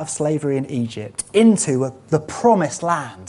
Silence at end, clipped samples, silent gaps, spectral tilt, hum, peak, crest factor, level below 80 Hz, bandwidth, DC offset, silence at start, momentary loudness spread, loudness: 0 s; under 0.1%; none; -5.5 dB/octave; none; -2 dBFS; 16 dB; -58 dBFS; 11.5 kHz; under 0.1%; 0 s; 10 LU; -19 LUFS